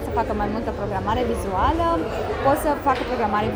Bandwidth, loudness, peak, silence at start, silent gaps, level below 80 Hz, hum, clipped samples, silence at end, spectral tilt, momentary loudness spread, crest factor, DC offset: over 20 kHz; -23 LUFS; -6 dBFS; 0 s; none; -34 dBFS; none; under 0.1%; 0 s; -6 dB/octave; 5 LU; 16 dB; under 0.1%